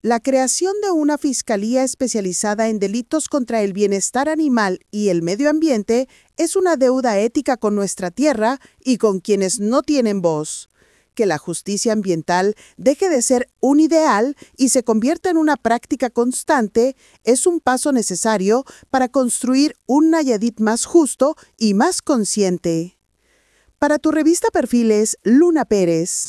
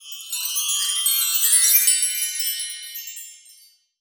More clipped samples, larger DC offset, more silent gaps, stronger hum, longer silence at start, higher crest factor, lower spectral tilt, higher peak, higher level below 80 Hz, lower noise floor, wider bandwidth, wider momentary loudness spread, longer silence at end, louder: neither; neither; neither; neither; about the same, 0.05 s vs 0 s; about the same, 16 dB vs 20 dB; first, -4 dB/octave vs 10 dB/octave; about the same, -2 dBFS vs -4 dBFS; first, -56 dBFS vs under -90 dBFS; first, -59 dBFS vs -53 dBFS; second, 12 kHz vs over 20 kHz; second, 6 LU vs 18 LU; second, 0 s vs 0.65 s; about the same, -18 LUFS vs -18 LUFS